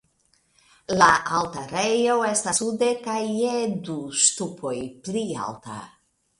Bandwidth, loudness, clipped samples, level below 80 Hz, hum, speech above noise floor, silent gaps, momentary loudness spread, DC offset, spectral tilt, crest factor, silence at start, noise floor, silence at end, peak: 11.5 kHz; -23 LUFS; under 0.1%; -60 dBFS; none; 42 dB; none; 14 LU; under 0.1%; -2.5 dB/octave; 22 dB; 0.9 s; -66 dBFS; 0.5 s; -2 dBFS